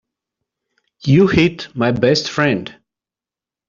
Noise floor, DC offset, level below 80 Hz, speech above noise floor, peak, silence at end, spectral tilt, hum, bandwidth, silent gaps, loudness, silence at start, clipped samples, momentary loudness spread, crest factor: -89 dBFS; under 0.1%; -46 dBFS; 74 dB; -2 dBFS; 0.95 s; -6 dB/octave; none; 7.6 kHz; none; -16 LUFS; 1.05 s; under 0.1%; 11 LU; 16 dB